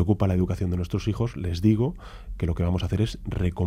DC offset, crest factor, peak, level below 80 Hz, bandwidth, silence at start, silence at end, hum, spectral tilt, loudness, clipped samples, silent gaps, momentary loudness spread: under 0.1%; 16 dB; -8 dBFS; -38 dBFS; 13 kHz; 0 s; 0 s; none; -8 dB/octave; -26 LUFS; under 0.1%; none; 7 LU